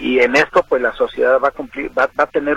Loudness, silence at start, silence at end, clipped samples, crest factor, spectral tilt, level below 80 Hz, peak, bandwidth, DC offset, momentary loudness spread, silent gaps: -16 LUFS; 0 s; 0 s; under 0.1%; 16 dB; -4.5 dB/octave; -46 dBFS; 0 dBFS; 10.5 kHz; under 0.1%; 7 LU; none